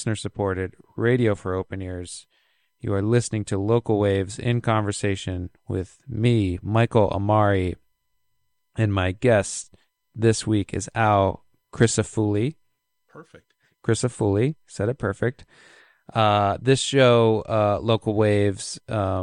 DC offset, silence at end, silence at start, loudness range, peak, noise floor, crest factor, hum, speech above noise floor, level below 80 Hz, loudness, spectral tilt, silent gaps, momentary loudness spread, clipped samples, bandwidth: under 0.1%; 0 s; 0 s; 5 LU; -2 dBFS; -77 dBFS; 20 dB; none; 54 dB; -50 dBFS; -23 LUFS; -6 dB/octave; none; 12 LU; under 0.1%; 11 kHz